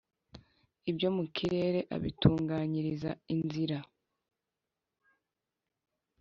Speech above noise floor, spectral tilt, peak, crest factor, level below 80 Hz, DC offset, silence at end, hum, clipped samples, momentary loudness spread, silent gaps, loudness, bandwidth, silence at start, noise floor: 57 dB; -6.5 dB/octave; -10 dBFS; 26 dB; -56 dBFS; under 0.1%; 2.35 s; none; under 0.1%; 9 LU; none; -33 LUFS; 7.4 kHz; 0.35 s; -89 dBFS